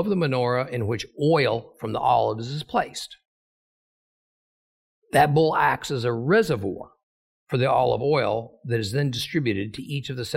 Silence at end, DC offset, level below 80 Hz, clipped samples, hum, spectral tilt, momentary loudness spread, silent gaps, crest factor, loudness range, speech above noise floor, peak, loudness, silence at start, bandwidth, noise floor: 0 s; under 0.1%; -56 dBFS; under 0.1%; none; -6 dB/octave; 10 LU; 3.27-5.02 s, 7.03-7.47 s; 18 dB; 5 LU; over 67 dB; -6 dBFS; -24 LUFS; 0 s; 16 kHz; under -90 dBFS